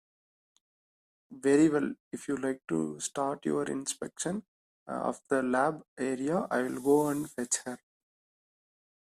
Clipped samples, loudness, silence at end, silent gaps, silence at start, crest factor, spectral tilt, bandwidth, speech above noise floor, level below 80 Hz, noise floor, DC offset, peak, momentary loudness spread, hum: under 0.1%; -31 LUFS; 1.4 s; 2.00-2.11 s, 4.48-4.86 s, 5.88-5.96 s; 1.3 s; 18 dB; -4.5 dB/octave; 14.5 kHz; over 60 dB; -74 dBFS; under -90 dBFS; under 0.1%; -14 dBFS; 10 LU; none